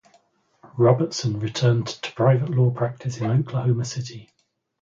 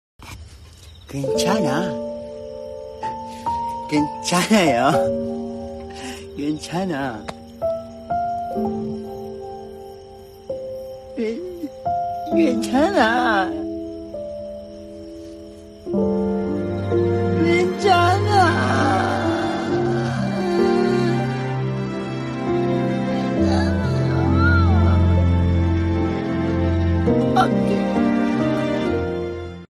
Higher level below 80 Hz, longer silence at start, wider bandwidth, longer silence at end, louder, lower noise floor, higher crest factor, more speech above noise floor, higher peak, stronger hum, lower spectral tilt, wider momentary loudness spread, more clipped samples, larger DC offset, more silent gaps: second, -60 dBFS vs -42 dBFS; first, 0.75 s vs 0.2 s; second, 7.6 kHz vs 13.5 kHz; first, 0.6 s vs 0.05 s; about the same, -22 LUFS vs -20 LUFS; first, -61 dBFS vs -42 dBFS; about the same, 18 dB vs 18 dB; first, 40 dB vs 23 dB; about the same, -4 dBFS vs -4 dBFS; neither; about the same, -6.5 dB/octave vs -6.5 dB/octave; second, 11 LU vs 17 LU; neither; neither; neither